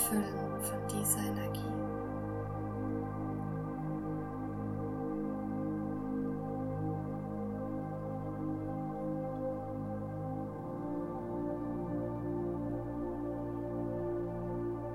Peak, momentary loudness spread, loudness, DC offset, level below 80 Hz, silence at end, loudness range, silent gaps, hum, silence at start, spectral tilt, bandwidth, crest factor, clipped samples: -16 dBFS; 3 LU; -38 LUFS; under 0.1%; -56 dBFS; 0 s; 2 LU; none; none; 0 s; -6.5 dB/octave; 17 kHz; 20 dB; under 0.1%